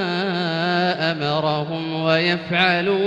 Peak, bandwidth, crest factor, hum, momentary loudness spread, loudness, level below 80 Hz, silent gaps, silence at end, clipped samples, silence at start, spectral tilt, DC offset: -4 dBFS; 8.2 kHz; 16 dB; none; 5 LU; -20 LUFS; -60 dBFS; none; 0 s; under 0.1%; 0 s; -6.5 dB/octave; under 0.1%